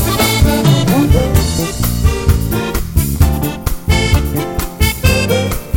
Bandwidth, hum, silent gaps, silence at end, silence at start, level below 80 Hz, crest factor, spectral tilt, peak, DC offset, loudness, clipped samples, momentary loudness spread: 17 kHz; none; none; 0 s; 0 s; -18 dBFS; 12 dB; -5 dB/octave; 0 dBFS; under 0.1%; -14 LUFS; under 0.1%; 6 LU